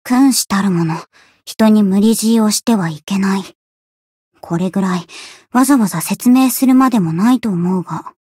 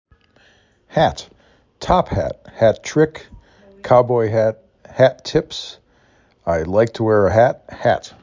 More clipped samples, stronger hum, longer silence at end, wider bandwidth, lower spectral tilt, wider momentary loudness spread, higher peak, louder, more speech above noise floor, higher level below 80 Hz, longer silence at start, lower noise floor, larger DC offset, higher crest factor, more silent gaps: neither; neither; about the same, 0.25 s vs 0.15 s; first, 16 kHz vs 7.6 kHz; second, -5 dB/octave vs -6.5 dB/octave; second, 12 LU vs 17 LU; about the same, -2 dBFS vs 0 dBFS; first, -14 LUFS vs -18 LUFS; first, over 76 dB vs 39 dB; second, -58 dBFS vs -40 dBFS; second, 0.05 s vs 0.95 s; first, under -90 dBFS vs -56 dBFS; neither; second, 12 dB vs 18 dB; first, 3.55-4.31 s vs none